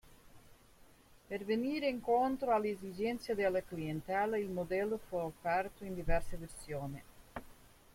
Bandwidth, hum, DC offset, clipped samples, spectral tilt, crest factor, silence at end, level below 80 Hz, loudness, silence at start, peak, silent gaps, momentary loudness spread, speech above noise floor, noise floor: 16.5 kHz; none; under 0.1%; under 0.1%; -6 dB/octave; 18 dB; 0.25 s; -50 dBFS; -37 LUFS; 0.05 s; -18 dBFS; none; 15 LU; 26 dB; -62 dBFS